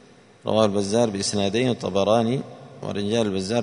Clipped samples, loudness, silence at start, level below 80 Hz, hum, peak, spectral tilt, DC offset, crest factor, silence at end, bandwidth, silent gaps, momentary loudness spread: under 0.1%; -23 LUFS; 0.45 s; -60 dBFS; none; -4 dBFS; -5 dB/octave; under 0.1%; 20 dB; 0 s; 11 kHz; none; 11 LU